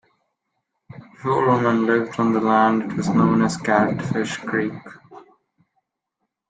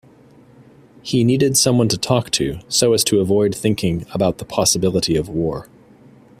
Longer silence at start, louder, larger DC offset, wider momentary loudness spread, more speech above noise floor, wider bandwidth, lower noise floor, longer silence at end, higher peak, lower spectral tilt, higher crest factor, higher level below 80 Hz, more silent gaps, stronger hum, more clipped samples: about the same, 0.95 s vs 1.05 s; second, -20 LUFS vs -17 LUFS; neither; about the same, 7 LU vs 8 LU; first, 59 dB vs 30 dB; second, 9.4 kHz vs 16 kHz; first, -78 dBFS vs -47 dBFS; first, 1.25 s vs 0.75 s; about the same, -2 dBFS vs 0 dBFS; first, -6.5 dB/octave vs -4.5 dB/octave; about the same, 18 dB vs 18 dB; second, -58 dBFS vs -46 dBFS; neither; neither; neither